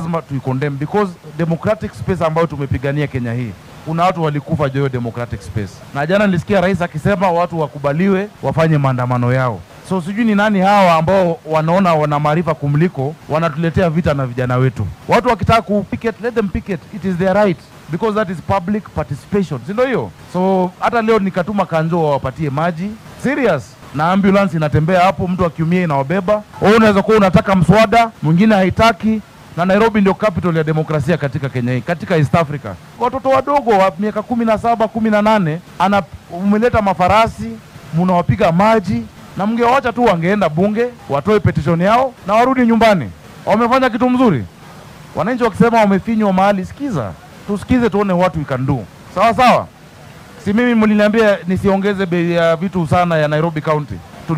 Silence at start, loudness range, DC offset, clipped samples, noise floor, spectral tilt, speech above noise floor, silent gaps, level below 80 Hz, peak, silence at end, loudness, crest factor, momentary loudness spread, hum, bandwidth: 0 s; 5 LU; under 0.1%; under 0.1%; -38 dBFS; -7.5 dB/octave; 24 dB; none; -42 dBFS; 0 dBFS; 0 s; -15 LUFS; 14 dB; 10 LU; none; 15.5 kHz